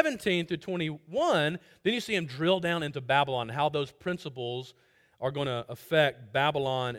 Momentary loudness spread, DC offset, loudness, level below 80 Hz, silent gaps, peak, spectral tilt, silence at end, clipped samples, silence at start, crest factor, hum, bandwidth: 10 LU; under 0.1%; -29 LUFS; -66 dBFS; none; -8 dBFS; -5.5 dB/octave; 0 s; under 0.1%; 0 s; 22 dB; none; 17 kHz